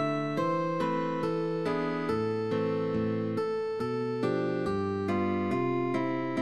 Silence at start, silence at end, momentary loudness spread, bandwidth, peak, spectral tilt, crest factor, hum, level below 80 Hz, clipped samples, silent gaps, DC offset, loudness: 0 s; 0 s; 2 LU; 12 kHz; -18 dBFS; -8 dB/octave; 12 dB; none; -62 dBFS; under 0.1%; none; 0.2%; -30 LUFS